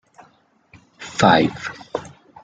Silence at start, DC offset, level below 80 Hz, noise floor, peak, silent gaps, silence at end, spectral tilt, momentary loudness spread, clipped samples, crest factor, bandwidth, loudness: 1 s; under 0.1%; -54 dBFS; -57 dBFS; -2 dBFS; none; 0.35 s; -5 dB/octave; 17 LU; under 0.1%; 20 dB; 9.4 kHz; -19 LUFS